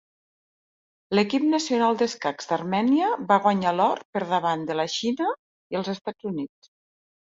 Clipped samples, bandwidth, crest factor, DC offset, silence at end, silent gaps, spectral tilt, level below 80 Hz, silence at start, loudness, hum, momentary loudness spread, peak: under 0.1%; 7.8 kHz; 18 dB; under 0.1%; 0.8 s; 4.05-4.13 s, 5.39-5.70 s, 6.01-6.05 s; -5 dB/octave; -70 dBFS; 1.1 s; -24 LUFS; none; 10 LU; -6 dBFS